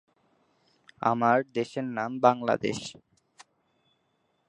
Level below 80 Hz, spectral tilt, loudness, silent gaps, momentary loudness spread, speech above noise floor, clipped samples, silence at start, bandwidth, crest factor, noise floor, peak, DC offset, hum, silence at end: -70 dBFS; -5.5 dB/octave; -27 LUFS; none; 9 LU; 47 dB; under 0.1%; 1 s; 11 kHz; 24 dB; -73 dBFS; -6 dBFS; under 0.1%; none; 1.55 s